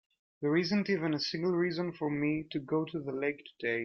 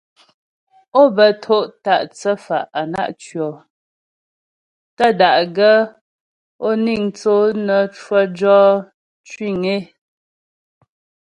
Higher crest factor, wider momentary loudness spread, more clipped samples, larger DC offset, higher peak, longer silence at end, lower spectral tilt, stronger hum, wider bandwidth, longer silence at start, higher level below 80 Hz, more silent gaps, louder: about the same, 16 dB vs 18 dB; second, 6 LU vs 13 LU; neither; neither; second, -16 dBFS vs 0 dBFS; second, 0 s vs 1.4 s; about the same, -6.5 dB/octave vs -5.5 dB/octave; neither; second, 7 kHz vs 10.5 kHz; second, 0.4 s vs 0.95 s; second, -70 dBFS vs -62 dBFS; second, none vs 3.70-4.97 s, 6.01-6.59 s, 8.94-9.24 s; second, -33 LUFS vs -16 LUFS